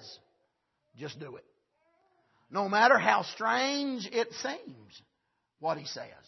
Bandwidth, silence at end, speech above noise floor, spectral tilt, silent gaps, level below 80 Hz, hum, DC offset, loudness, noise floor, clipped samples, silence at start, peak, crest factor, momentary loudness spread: 6.2 kHz; 0.15 s; 50 dB; -3.5 dB/octave; none; -82 dBFS; none; under 0.1%; -29 LUFS; -80 dBFS; under 0.1%; 0 s; -10 dBFS; 24 dB; 22 LU